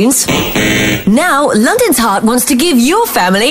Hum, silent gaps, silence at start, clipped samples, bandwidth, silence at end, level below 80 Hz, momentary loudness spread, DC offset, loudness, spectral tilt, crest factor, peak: none; none; 0 s; under 0.1%; 16.5 kHz; 0 s; -36 dBFS; 2 LU; under 0.1%; -10 LUFS; -3.5 dB/octave; 8 dB; 0 dBFS